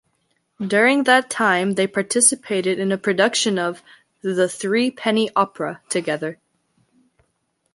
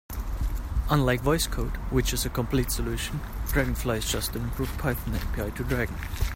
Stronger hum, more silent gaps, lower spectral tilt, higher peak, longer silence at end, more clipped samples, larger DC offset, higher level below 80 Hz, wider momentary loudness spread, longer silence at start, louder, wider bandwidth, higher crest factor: neither; neither; second, -3 dB/octave vs -5 dB/octave; first, 0 dBFS vs -10 dBFS; first, 1.4 s vs 0 s; neither; neither; second, -70 dBFS vs -32 dBFS; first, 11 LU vs 8 LU; first, 0.6 s vs 0.1 s; first, -19 LUFS vs -28 LUFS; second, 11.5 kHz vs 16.5 kHz; about the same, 20 dB vs 18 dB